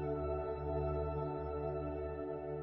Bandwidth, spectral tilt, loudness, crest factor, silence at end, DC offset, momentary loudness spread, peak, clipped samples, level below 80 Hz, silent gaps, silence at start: 4.2 kHz; -9 dB/octave; -40 LUFS; 12 dB; 0 s; under 0.1%; 4 LU; -26 dBFS; under 0.1%; -48 dBFS; none; 0 s